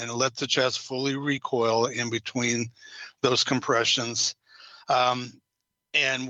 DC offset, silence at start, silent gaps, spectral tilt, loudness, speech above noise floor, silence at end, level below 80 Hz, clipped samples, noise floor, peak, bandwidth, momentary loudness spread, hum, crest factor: under 0.1%; 0 s; none; -3 dB/octave; -25 LUFS; 57 dB; 0 s; -72 dBFS; under 0.1%; -83 dBFS; -8 dBFS; 8.8 kHz; 12 LU; none; 20 dB